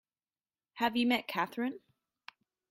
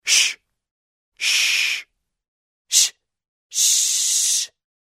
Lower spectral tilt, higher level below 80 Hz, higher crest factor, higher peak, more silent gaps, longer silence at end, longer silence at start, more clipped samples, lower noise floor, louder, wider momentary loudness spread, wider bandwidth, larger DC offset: first, -4.5 dB/octave vs 6.5 dB/octave; about the same, -80 dBFS vs -80 dBFS; about the same, 20 dB vs 22 dB; second, -16 dBFS vs -2 dBFS; second, none vs 0.71-1.12 s, 2.28-2.65 s, 3.28-3.50 s; first, 0.95 s vs 0.55 s; first, 0.75 s vs 0.05 s; neither; first, under -90 dBFS vs -42 dBFS; second, -33 LUFS vs -17 LUFS; first, 18 LU vs 11 LU; about the same, 16 kHz vs 16 kHz; neither